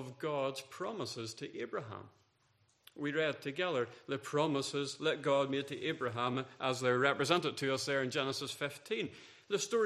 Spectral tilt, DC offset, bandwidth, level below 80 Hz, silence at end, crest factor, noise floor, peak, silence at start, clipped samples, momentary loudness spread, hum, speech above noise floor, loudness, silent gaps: -4 dB/octave; under 0.1%; 14.5 kHz; -80 dBFS; 0 s; 24 dB; -73 dBFS; -12 dBFS; 0 s; under 0.1%; 10 LU; none; 37 dB; -36 LUFS; none